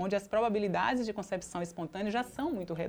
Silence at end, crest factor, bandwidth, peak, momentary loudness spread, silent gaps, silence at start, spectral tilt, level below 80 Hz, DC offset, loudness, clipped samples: 0 s; 16 dB; over 20 kHz; -16 dBFS; 8 LU; none; 0 s; -5.5 dB/octave; -60 dBFS; under 0.1%; -33 LUFS; under 0.1%